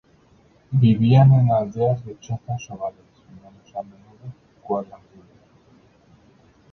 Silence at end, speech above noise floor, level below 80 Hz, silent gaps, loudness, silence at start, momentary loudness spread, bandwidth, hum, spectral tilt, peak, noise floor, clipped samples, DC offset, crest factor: 1.9 s; 36 dB; -54 dBFS; none; -20 LUFS; 0.7 s; 27 LU; 6.4 kHz; none; -9 dB/octave; -4 dBFS; -56 dBFS; under 0.1%; under 0.1%; 18 dB